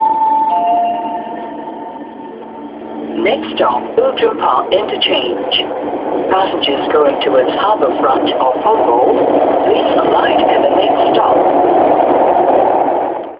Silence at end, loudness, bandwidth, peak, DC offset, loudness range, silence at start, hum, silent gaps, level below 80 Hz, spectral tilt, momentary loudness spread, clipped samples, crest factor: 0 s; -12 LUFS; 5.4 kHz; 0 dBFS; under 0.1%; 7 LU; 0 s; none; none; -50 dBFS; -9.5 dB/octave; 15 LU; under 0.1%; 12 dB